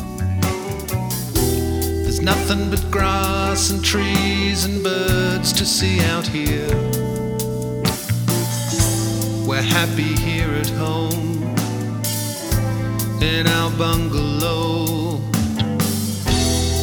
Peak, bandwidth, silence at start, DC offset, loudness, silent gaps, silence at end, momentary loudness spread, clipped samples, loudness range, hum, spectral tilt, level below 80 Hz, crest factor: -2 dBFS; over 20 kHz; 0 s; under 0.1%; -19 LUFS; none; 0 s; 5 LU; under 0.1%; 3 LU; none; -4.5 dB/octave; -30 dBFS; 18 dB